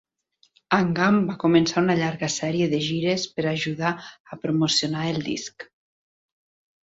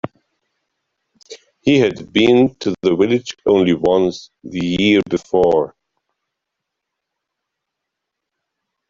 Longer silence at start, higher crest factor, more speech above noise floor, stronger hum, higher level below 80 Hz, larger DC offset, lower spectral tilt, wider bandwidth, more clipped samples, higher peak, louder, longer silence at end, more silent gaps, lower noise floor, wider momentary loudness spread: first, 0.7 s vs 0.05 s; about the same, 18 dB vs 16 dB; second, 42 dB vs 64 dB; neither; second, -60 dBFS vs -52 dBFS; neither; about the same, -5 dB/octave vs -6 dB/octave; about the same, 8 kHz vs 7.6 kHz; neither; second, -6 dBFS vs -2 dBFS; second, -23 LUFS vs -16 LUFS; second, 1.2 s vs 3.2 s; first, 4.20-4.25 s vs none; second, -65 dBFS vs -80 dBFS; first, 13 LU vs 10 LU